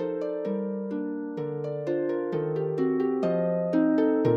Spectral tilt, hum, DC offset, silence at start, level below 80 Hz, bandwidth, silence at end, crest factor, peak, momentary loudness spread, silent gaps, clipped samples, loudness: -10 dB/octave; none; under 0.1%; 0 s; -74 dBFS; 6.2 kHz; 0 s; 16 dB; -10 dBFS; 9 LU; none; under 0.1%; -28 LUFS